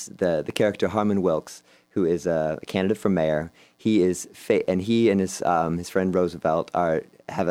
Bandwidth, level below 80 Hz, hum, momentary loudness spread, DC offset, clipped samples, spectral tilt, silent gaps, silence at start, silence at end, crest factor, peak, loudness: 16 kHz; -56 dBFS; none; 8 LU; under 0.1%; under 0.1%; -6 dB/octave; none; 0 s; 0 s; 18 dB; -6 dBFS; -24 LUFS